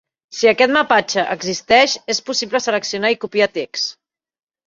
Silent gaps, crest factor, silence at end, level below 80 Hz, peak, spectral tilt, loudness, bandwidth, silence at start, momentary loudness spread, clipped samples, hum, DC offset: none; 18 dB; 0.75 s; -60 dBFS; 0 dBFS; -2 dB/octave; -17 LUFS; 7.6 kHz; 0.3 s; 10 LU; under 0.1%; none; under 0.1%